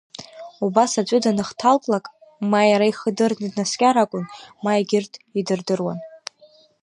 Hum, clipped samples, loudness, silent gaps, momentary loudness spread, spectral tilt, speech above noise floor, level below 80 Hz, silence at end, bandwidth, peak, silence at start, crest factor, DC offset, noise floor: none; under 0.1%; -21 LUFS; none; 18 LU; -4.5 dB/octave; 33 dB; -68 dBFS; 0.65 s; 11 kHz; -2 dBFS; 0.2 s; 18 dB; under 0.1%; -53 dBFS